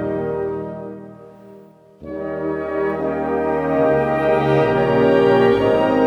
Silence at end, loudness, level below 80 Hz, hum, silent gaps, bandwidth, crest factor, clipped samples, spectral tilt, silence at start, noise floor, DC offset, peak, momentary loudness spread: 0 s; -18 LUFS; -46 dBFS; none; none; 9 kHz; 16 dB; under 0.1%; -8 dB/octave; 0 s; -45 dBFS; under 0.1%; -2 dBFS; 15 LU